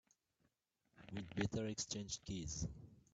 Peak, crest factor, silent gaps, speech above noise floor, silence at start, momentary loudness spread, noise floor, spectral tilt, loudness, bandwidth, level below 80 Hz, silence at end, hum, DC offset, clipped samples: -24 dBFS; 24 dB; none; 39 dB; 0.95 s; 11 LU; -84 dBFS; -4 dB/octave; -45 LUFS; 9 kHz; -62 dBFS; 0.15 s; none; under 0.1%; under 0.1%